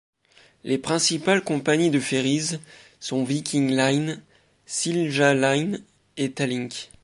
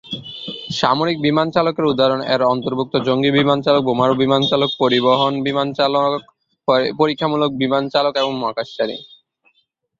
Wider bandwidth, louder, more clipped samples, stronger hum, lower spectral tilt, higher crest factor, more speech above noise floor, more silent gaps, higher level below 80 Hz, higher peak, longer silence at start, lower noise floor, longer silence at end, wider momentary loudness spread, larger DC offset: first, 11.5 kHz vs 7.6 kHz; second, -23 LUFS vs -17 LUFS; neither; neither; second, -4 dB/octave vs -6 dB/octave; about the same, 18 dB vs 16 dB; second, 34 dB vs 48 dB; neither; second, -66 dBFS vs -58 dBFS; second, -6 dBFS vs -2 dBFS; first, 0.65 s vs 0.05 s; second, -57 dBFS vs -65 dBFS; second, 0.2 s vs 0.95 s; first, 14 LU vs 9 LU; neither